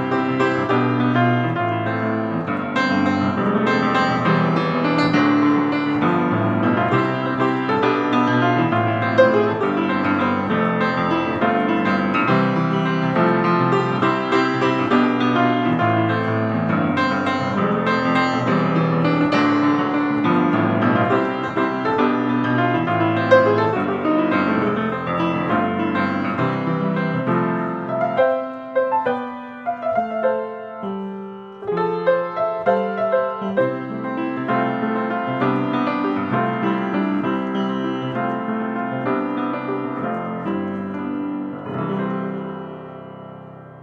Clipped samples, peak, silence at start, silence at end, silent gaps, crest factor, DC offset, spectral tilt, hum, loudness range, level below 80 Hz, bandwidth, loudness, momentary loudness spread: under 0.1%; -2 dBFS; 0 s; 0 s; none; 18 dB; under 0.1%; -7.5 dB/octave; none; 6 LU; -60 dBFS; 7.8 kHz; -20 LUFS; 8 LU